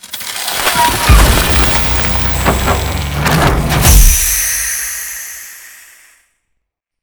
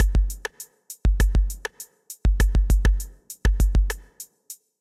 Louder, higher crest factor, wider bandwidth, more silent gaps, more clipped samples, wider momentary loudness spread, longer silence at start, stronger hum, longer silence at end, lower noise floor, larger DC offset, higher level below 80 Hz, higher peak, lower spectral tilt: first, -11 LUFS vs -25 LUFS; about the same, 12 dB vs 16 dB; first, over 20 kHz vs 14.5 kHz; neither; first, 0.2% vs under 0.1%; second, 13 LU vs 20 LU; about the same, 0.05 s vs 0 s; neither; first, 1.3 s vs 0.25 s; first, -71 dBFS vs -46 dBFS; neither; first, -16 dBFS vs -22 dBFS; first, 0 dBFS vs -6 dBFS; second, -3 dB/octave vs -5 dB/octave